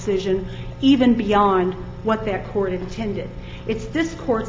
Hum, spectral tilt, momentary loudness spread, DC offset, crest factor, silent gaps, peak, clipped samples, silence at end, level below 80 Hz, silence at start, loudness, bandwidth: none; -6.5 dB/octave; 12 LU; under 0.1%; 16 dB; none; -4 dBFS; under 0.1%; 0 s; -38 dBFS; 0 s; -21 LUFS; 7.6 kHz